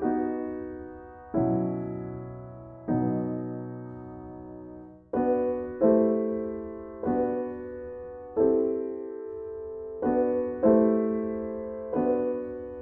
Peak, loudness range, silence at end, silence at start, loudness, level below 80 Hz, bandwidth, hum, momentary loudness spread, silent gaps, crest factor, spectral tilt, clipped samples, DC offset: -8 dBFS; 5 LU; 0 s; 0 s; -28 LUFS; -56 dBFS; 2.8 kHz; none; 18 LU; none; 20 dB; -13 dB/octave; under 0.1%; under 0.1%